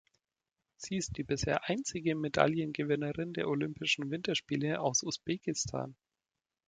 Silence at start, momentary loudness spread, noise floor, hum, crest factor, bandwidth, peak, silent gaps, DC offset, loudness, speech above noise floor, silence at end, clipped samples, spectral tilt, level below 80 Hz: 0.8 s; 7 LU; under -90 dBFS; none; 26 dB; 9.6 kHz; -10 dBFS; none; under 0.1%; -34 LUFS; over 56 dB; 0.75 s; under 0.1%; -4 dB/octave; -60 dBFS